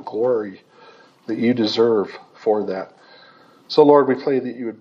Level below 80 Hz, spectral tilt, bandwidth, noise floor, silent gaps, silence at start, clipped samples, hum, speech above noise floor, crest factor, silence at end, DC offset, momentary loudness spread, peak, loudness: -78 dBFS; -6.5 dB/octave; 7.2 kHz; -49 dBFS; none; 0 s; under 0.1%; none; 31 dB; 20 dB; 0.05 s; under 0.1%; 17 LU; 0 dBFS; -19 LUFS